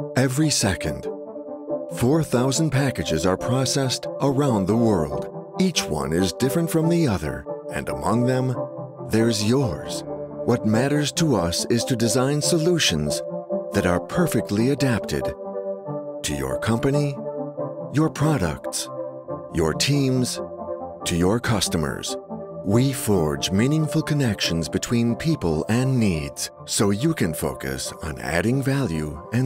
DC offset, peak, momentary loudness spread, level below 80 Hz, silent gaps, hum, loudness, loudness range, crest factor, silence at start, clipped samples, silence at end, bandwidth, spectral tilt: under 0.1%; -6 dBFS; 10 LU; -44 dBFS; none; none; -23 LUFS; 3 LU; 16 dB; 0 s; under 0.1%; 0 s; 16 kHz; -5 dB/octave